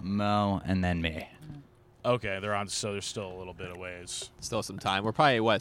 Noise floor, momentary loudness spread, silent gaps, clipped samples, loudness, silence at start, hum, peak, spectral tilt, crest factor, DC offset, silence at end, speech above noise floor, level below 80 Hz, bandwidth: -52 dBFS; 16 LU; none; under 0.1%; -30 LUFS; 0 s; none; -8 dBFS; -4.5 dB/octave; 22 dB; under 0.1%; 0 s; 22 dB; -54 dBFS; 16.5 kHz